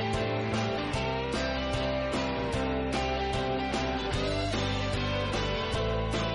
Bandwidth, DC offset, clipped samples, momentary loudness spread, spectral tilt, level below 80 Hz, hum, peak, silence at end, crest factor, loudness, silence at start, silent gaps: 11.5 kHz; under 0.1%; under 0.1%; 1 LU; -5.5 dB/octave; -40 dBFS; none; -18 dBFS; 0 s; 12 dB; -30 LUFS; 0 s; none